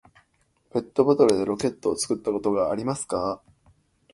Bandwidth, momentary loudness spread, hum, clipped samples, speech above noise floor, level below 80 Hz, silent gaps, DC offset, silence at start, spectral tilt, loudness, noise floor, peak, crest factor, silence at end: 11.5 kHz; 12 LU; none; under 0.1%; 44 dB; -58 dBFS; none; under 0.1%; 0.75 s; -5 dB/octave; -24 LUFS; -67 dBFS; -4 dBFS; 22 dB; 0.8 s